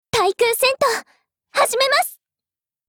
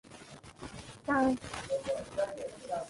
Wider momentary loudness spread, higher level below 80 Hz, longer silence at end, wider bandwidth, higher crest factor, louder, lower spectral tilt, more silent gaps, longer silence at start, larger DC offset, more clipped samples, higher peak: second, 9 LU vs 20 LU; about the same, -58 dBFS vs -60 dBFS; first, 0.75 s vs 0 s; first, over 20 kHz vs 11.5 kHz; about the same, 16 dB vs 18 dB; first, -18 LUFS vs -34 LUFS; second, -1 dB/octave vs -5 dB/octave; neither; about the same, 0.15 s vs 0.05 s; neither; neither; first, -6 dBFS vs -18 dBFS